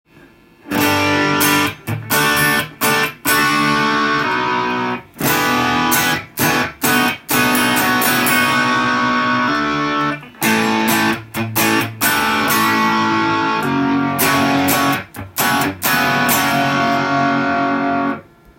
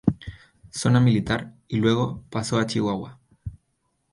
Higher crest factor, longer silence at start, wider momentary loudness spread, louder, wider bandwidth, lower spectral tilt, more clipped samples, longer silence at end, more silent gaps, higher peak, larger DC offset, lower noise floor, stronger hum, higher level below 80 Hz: about the same, 16 dB vs 20 dB; first, 0.65 s vs 0.05 s; second, 5 LU vs 21 LU; first, -15 LUFS vs -24 LUFS; first, 17 kHz vs 11.5 kHz; second, -3 dB/octave vs -6 dB/octave; neither; second, 0.35 s vs 0.55 s; neither; first, 0 dBFS vs -4 dBFS; neither; second, -46 dBFS vs -72 dBFS; neither; about the same, -50 dBFS vs -48 dBFS